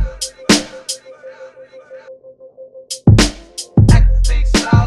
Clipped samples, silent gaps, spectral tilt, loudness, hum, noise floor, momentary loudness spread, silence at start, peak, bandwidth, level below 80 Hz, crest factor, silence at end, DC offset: under 0.1%; none; -5 dB/octave; -14 LUFS; none; -39 dBFS; 18 LU; 0 s; 0 dBFS; 13 kHz; -18 dBFS; 14 dB; 0 s; under 0.1%